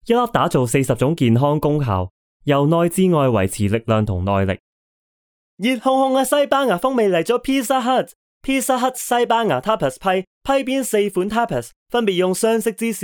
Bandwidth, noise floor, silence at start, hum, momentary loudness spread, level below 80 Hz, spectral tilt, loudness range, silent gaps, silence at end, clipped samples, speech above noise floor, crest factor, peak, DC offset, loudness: over 20 kHz; under -90 dBFS; 0.05 s; none; 6 LU; -46 dBFS; -5.5 dB/octave; 2 LU; 2.11-2.40 s, 4.60-5.57 s, 8.15-8.41 s, 10.27-10.41 s, 11.76-11.86 s; 0 s; under 0.1%; over 72 dB; 16 dB; -2 dBFS; under 0.1%; -18 LUFS